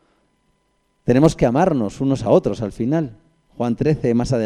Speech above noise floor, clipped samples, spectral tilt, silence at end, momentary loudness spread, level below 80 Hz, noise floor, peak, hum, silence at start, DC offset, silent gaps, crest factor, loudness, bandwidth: 48 dB; under 0.1%; -7.5 dB/octave; 0 s; 9 LU; -42 dBFS; -65 dBFS; 0 dBFS; none; 1.05 s; under 0.1%; none; 20 dB; -19 LUFS; 11.5 kHz